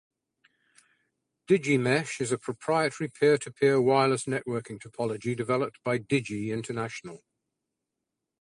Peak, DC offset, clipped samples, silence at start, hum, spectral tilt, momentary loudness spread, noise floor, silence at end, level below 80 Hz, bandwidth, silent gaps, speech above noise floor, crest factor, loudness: -10 dBFS; under 0.1%; under 0.1%; 1.5 s; none; -5.5 dB/octave; 10 LU; -86 dBFS; 1.25 s; -68 dBFS; 11 kHz; none; 58 dB; 20 dB; -27 LUFS